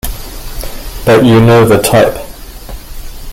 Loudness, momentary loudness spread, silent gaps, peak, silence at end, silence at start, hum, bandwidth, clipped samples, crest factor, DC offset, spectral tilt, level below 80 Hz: -7 LUFS; 24 LU; none; 0 dBFS; 0 s; 0.05 s; none; 17 kHz; under 0.1%; 10 dB; under 0.1%; -6 dB/octave; -26 dBFS